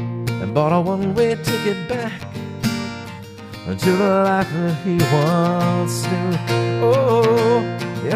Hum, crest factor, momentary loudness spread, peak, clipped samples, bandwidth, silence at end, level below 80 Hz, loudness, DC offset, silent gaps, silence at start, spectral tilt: none; 16 dB; 13 LU; -4 dBFS; under 0.1%; 15.5 kHz; 0 s; -50 dBFS; -19 LUFS; under 0.1%; none; 0 s; -6.5 dB/octave